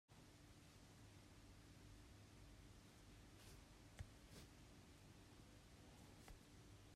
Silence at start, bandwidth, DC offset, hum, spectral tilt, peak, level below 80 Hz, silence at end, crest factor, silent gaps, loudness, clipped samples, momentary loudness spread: 0.1 s; 15 kHz; under 0.1%; none; -4.5 dB/octave; -42 dBFS; -70 dBFS; 0 s; 22 dB; none; -65 LUFS; under 0.1%; 4 LU